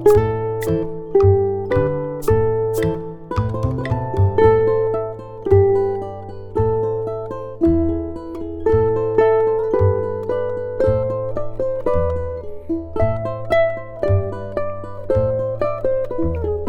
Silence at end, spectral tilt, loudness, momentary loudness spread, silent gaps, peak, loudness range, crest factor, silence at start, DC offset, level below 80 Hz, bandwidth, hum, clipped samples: 0 s; -8.5 dB/octave; -20 LUFS; 12 LU; none; -2 dBFS; 3 LU; 16 dB; 0 s; under 0.1%; -36 dBFS; 19 kHz; none; under 0.1%